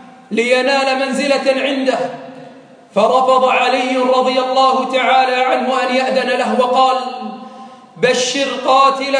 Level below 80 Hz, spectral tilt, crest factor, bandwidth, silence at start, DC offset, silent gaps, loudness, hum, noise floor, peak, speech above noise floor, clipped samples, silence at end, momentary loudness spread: -68 dBFS; -3 dB/octave; 14 dB; 10.5 kHz; 0 s; under 0.1%; none; -14 LUFS; none; -39 dBFS; -2 dBFS; 25 dB; under 0.1%; 0 s; 10 LU